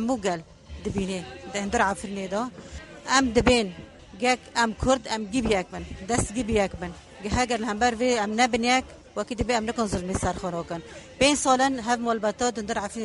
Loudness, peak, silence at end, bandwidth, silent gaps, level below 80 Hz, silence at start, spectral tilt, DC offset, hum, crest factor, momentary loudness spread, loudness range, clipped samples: -25 LUFS; -6 dBFS; 0 s; 11.5 kHz; none; -42 dBFS; 0 s; -4 dB/octave; under 0.1%; none; 20 dB; 15 LU; 2 LU; under 0.1%